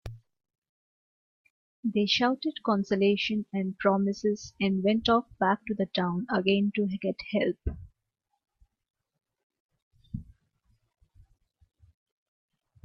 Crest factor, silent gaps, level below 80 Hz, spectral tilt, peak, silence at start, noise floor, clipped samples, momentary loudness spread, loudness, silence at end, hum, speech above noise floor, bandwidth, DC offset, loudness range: 22 dB; 0.58-0.62 s, 0.69-1.83 s, 8.90-8.94 s, 9.43-9.50 s, 9.60-9.69 s, 9.82-9.91 s; -52 dBFS; -6 dB/octave; -10 dBFS; 0.05 s; -82 dBFS; under 0.1%; 13 LU; -28 LUFS; 2.65 s; none; 54 dB; 7 kHz; under 0.1%; 9 LU